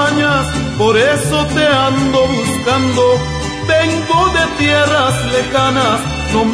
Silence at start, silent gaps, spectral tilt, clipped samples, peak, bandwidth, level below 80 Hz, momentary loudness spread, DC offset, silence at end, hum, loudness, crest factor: 0 s; none; -4.5 dB/octave; under 0.1%; -2 dBFS; 11 kHz; -32 dBFS; 4 LU; under 0.1%; 0 s; none; -13 LUFS; 12 dB